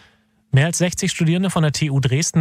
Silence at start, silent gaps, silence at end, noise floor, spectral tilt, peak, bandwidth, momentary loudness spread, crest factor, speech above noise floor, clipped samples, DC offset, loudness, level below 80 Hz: 0.55 s; none; 0 s; -56 dBFS; -5 dB/octave; -6 dBFS; 15.5 kHz; 2 LU; 12 dB; 39 dB; under 0.1%; under 0.1%; -19 LUFS; -48 dBFS